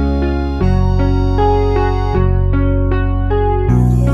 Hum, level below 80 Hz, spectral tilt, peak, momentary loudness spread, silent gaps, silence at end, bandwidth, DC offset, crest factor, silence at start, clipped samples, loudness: none; -16 dBFS; -9 dB/octave; -2 dBFS; 3 LU; none; 0 s; 7 kHz; under 0.1%; 10 dB; 0 s; under 0.1%; -15 LUFS